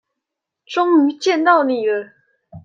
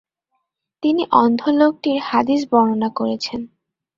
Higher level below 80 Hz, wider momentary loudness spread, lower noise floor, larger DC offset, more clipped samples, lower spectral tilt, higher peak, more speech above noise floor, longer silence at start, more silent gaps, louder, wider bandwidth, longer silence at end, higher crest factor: second, -68 dBFS vs -60 dBFS; about the same, 9 LU vs 10 LU; first, -81 dBFS vs -73 dBFS; neither; neither; about the same, -4.5 dB/octave vs -5.5 dB/octave; about the same, -2 dBFS vs -2 dBFS; first, 66 dB vs 56 dB; about the same, 0.7 s vs 0.8 s; neither; about the same, -16 LUFS vs -18 LUFS; about the same, 7.6 kHz vs 7.4 kHz; second, 0.05 s vs 0.5 s; about the same, 16 dB vs 18 dB